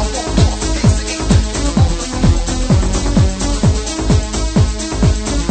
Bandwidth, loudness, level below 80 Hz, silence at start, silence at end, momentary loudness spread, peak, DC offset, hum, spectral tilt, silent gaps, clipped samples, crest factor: 9.2 kHz; -15 LUFS; -18 dBFS; 0 s; 0 s; 3 LU; 0 dBFS; under 0.1%; none; -5.5 dB/octave; none; under 0.1%; 14 dB